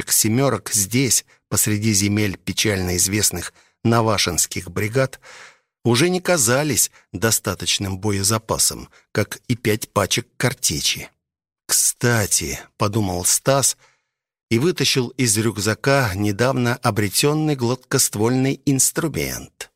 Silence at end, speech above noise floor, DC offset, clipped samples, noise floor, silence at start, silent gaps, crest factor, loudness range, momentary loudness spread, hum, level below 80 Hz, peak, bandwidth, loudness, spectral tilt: 0.1 s; 51 dB; under 0.1%; under 0.1%; -71 dBFS; 0 s; 14.43-14.48 s; 18 dB; 2 LU; 8 LU; none; -48 dBFS; -2 dBFS; 16 kHz; -19 LUFS; -3.5 dB/octave